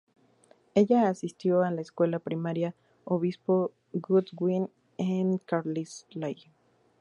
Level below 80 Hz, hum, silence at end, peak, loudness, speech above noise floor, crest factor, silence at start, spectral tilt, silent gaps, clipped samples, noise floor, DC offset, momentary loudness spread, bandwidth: -76 dBFS; none; 0.7 s; -10 dBFS; -29 LUFS; 35 dB; 18 dB; 0.75 s; -8 dB/octave; none; under 0.1%; -63 dBFS; under 0.1%; 12 LU; 11 kHz